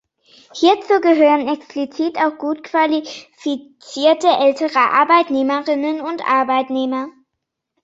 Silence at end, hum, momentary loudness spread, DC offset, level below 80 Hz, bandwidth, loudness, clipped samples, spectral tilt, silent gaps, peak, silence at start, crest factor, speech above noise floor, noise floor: 0.75 s; none; 12 LU; under 0.1%; -68 dBFS; 8 kHz; -17 LUFS; under 0.1%; -3.5 dB/octave; none; -2 dBFS; 0.55 s; 16 dB; 62 dB; -78 dBFS